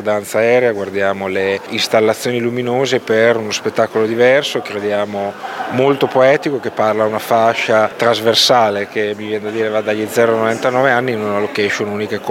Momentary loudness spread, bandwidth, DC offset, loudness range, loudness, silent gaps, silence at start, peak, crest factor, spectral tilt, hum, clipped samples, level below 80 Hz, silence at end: 8 LU; 17 kHz; under 0.1%; 2 LU; -15 LUFS; none; 0 s; 0 dBFS; 14 dB; -4 dB/octave; none; under 0.1%; -66 dBFS; 0 s